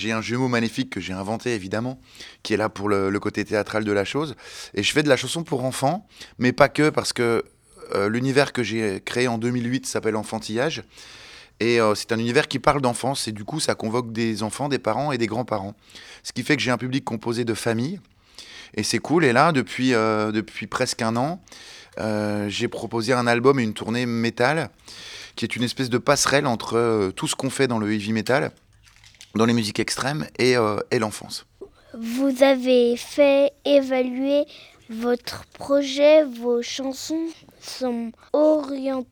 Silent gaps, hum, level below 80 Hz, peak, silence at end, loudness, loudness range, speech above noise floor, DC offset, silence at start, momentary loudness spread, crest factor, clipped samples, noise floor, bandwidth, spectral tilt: none; none; -56 dBFS; 0 dBFS; 0.1 s; -22 LUFS; 4 LU; 30 dB; under 0.1%; 0 s; 15 LU; 22 dB; under 0.1%; -52 dBFS; 19.5 kHz; -4.5 dB/octave